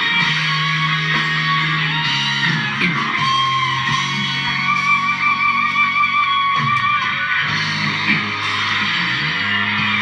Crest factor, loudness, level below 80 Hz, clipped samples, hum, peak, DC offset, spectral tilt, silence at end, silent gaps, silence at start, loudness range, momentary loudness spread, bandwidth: 14 dB; -16 LUFS; -54 dBFS; under 0.1%; none; -4 dBFS; under 0.1%; -3.5 dB/octave; 0 s; none; 0 s; 1 LU; 3 LU; 11 kHz